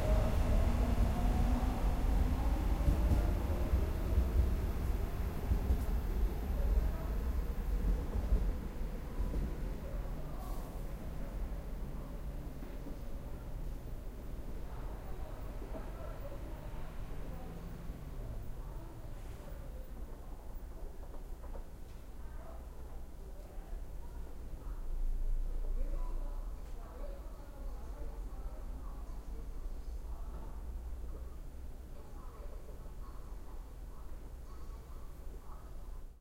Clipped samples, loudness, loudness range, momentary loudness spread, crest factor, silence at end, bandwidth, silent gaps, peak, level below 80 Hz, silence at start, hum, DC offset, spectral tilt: under 0.1%; -41 LUFS; 16 LU; 17 LU; 18 dB; 0.05 s; 16 kHz; none; -20 dBFS; -38 dBFS; 0 s; none; under 0.1%; -7.5 dB/octave